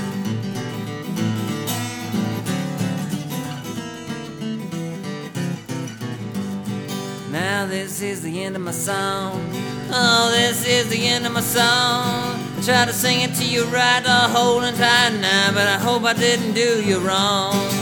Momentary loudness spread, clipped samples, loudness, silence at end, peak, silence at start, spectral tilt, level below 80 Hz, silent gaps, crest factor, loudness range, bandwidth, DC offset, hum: 13 LU; under 0.1%; -20 LUFS; 0 s; 0 dBFS; 0 s; -3.5 dB/octave; -54 dBFS; none; 20 dB; 11 LU; over 20 kHz; under 0.1%; none